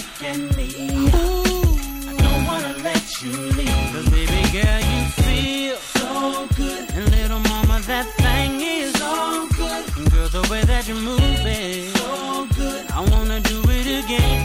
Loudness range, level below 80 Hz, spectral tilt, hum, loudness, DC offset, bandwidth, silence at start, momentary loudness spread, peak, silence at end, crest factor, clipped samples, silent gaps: 1 LU; -22 dBFS; -4.5 dB/octave; none; -20 LUFS; under 0.1%; 16.5 kHz; 0 s; 6 LU; -4 dBFS; 0 s; 16 dB; under 0.1%; none